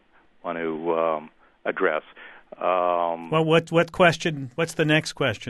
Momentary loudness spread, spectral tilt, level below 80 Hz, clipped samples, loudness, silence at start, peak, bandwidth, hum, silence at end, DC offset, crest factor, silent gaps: 12 LU; -5.5 dB/octave; -60 dBFS; under 0.1%; -23 LUFS; 0.45 s; -4 dBFS; 12.5 kHz; none; 0 s; under 0.1%; 20 dB; none